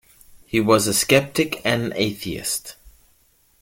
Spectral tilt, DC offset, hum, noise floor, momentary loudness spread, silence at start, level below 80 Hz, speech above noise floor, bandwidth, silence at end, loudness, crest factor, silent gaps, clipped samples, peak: -3.5 dB/octave; under 0.1%; none; -60 dBFS; 10 LU; 0.35 s; -52 dBFS; 39 dB; 17 kHz; 0.75 s; -20 LUFS; 20 dB; none; under 0.1%; -2 dBFS